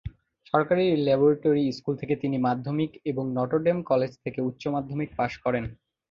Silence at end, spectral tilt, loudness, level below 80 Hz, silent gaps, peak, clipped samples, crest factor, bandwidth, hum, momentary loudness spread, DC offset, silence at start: 0.4 s; -8.5 dB/octave; -26 LUFS; -54 dBFS; none; -6 dBFS; under 0.1%; 20 dB; 7.2 kHz; none; 10 LU; under 0.1%; 0.05 s